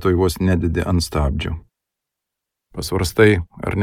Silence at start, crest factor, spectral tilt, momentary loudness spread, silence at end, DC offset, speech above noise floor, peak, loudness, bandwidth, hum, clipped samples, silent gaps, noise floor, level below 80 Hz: 0 s; 18 dB; -6 dB/octave; 14 LU; 0 s; under 0.1%; 65 dB; 0 dBFS; -19 LUFS; 16.5 kHz; none; under 0.1%; none; -83 dBFS; -32 dBFS